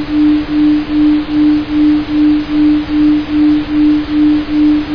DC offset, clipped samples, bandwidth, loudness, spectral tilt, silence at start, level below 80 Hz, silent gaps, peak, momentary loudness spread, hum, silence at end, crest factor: under 0.1%; under 0.1%; 5.4 kHz; -11 LUFS; -8 dB/octave; 0 s; -32 dBFS; none; -2 dBFS; 0 LU; none; 0 s; 8 dB